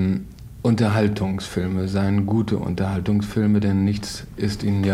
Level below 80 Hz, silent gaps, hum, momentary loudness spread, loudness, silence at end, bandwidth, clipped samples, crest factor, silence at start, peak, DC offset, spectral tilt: -44 dBFS; none; none; 8 LU; -22 LUFS; 0 s; 14 kHz; under 0.1%; 14 dB; 0 s; -6 dBFS; under 0.1%; -7 dB/octave